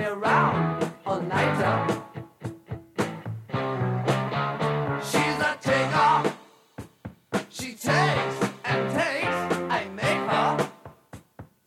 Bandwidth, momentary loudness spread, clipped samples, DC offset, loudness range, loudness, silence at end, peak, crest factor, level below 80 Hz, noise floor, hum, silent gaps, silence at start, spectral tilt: 16 kHz; 17 LU; under 0.1%; under 0.1%; 4 LU; -25 LUFS; 0.2 s; -10 dBFS; 16 dB; -58 dBFS; -48 dBFS; none; none; 0 s; -5.5 dB/octave